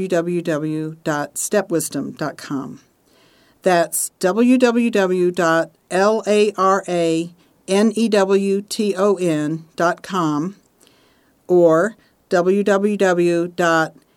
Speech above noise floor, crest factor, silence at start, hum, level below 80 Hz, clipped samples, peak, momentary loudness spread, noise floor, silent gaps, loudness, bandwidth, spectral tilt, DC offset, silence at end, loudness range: 39 dB; 18 dB; 0 s; none; -68 dBFS; under 0.1%; -2 dBFS; 10 LU; -57 dBFS; none; -18 LUFS; 18 kHz; -5 dB/octave; under 0.1%; 0.25 s; 5 LU